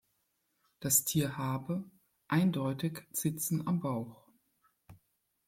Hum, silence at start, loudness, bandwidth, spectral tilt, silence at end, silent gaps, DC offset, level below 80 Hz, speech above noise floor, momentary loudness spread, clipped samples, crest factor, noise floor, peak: none; 0.8 s; -33 LUFS; 16.5 kHz; -4.5 dB/octave; 0.5 s; none; under 0.1%; -70 dBFS; 46 dB; 12 LU; under 0.1%; 24 dB; -79 dBFS; -12 dBFS